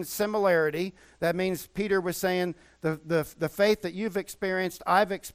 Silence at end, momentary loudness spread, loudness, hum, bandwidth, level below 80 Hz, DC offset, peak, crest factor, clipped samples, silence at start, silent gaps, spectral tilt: 0.05 s; 8 LU; -28 LUFS; none; 16 kHz; -60 dBFS; under 0.1%; -10 dBFS; 18 dB; under 0.1%; 0 s; none; -5 dB/octave